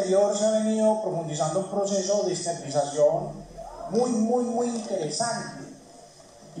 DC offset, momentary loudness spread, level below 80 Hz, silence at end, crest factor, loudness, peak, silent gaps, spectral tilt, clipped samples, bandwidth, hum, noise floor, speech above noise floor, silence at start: under 0.1%; 16 LU; -60 dBFS; 0 s; 16 dB; -25 LUFS; -10 dBFS; none; -4.5 dB/octave; under 0.1%; 10.5 kHz; none; -49 dBFS; 24 dB; 0 s